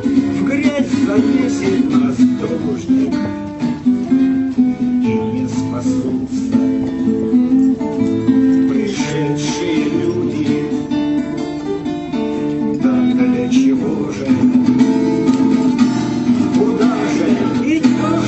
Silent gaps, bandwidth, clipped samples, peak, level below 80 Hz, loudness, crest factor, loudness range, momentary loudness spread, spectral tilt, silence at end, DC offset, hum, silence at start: none; 8.4 kHz; under 0.1%; 0 dBFS; -46 dBFS; -16 LUFS; 14 dB; 4 LU; 6 LU; -6.5 dB/octave; 0 s; under 0.1%; none; 0 s